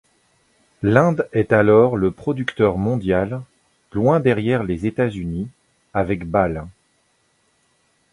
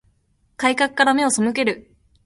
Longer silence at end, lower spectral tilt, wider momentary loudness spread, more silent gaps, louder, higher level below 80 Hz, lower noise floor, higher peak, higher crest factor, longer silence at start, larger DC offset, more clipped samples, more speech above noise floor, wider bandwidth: first, 1.4 s vs 0.45 s; first, -8.5 dB/octave vs -2.5 dB/octave; first, 13 LU vs 6 LU; neither; about the same, -19 LUFS vs -19 LUFS; first, -44 dBFS vs -60 dBFS; about the same, -64 dBFS vs -63 dBFS; about the same, 0 dBFS vs -2 dBFS; about the same, 20 dB vs 18 dB; first, 0.8 s vs 0.6 s; neither; neither; about the same, 46 dB vs 44 dB; about the same, 11 kHz vs 11.5 kHz